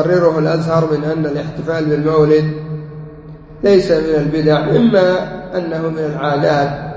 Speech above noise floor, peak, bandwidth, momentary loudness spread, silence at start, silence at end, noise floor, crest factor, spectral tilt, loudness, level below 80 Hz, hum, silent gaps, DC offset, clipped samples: 20 dB; 0 dBFS; 8 kHz; 11 LU; 0 s; 0 s; -34 dBFS; 14 dB; -8 dB/octave; -15 LUFS; -42 dBFS; none; none; under 0.1%; under 0.1%